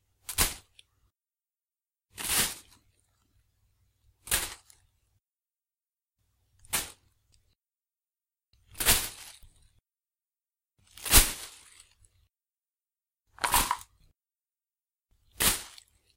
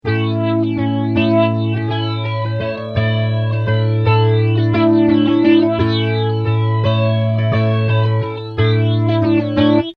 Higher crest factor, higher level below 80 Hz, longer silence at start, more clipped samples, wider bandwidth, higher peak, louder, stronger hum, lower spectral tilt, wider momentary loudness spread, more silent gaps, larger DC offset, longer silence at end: first, 32 dB vs 14 dB; about the same, -42 dBFS vs -44 dBFS; first, 0.3 s vs 0.05 s; neither; first, 16 kHz vs 5 kHz; about the same, -2 dBFS vs -2 dBFS; second, -27 LUFS vs -16 LUFS; neither; second, -1 dB/octave vs -9.5 dB/octave; first, 24 LU vs 7 LU; neither; neither; first, 0.45 s vs 0.05 s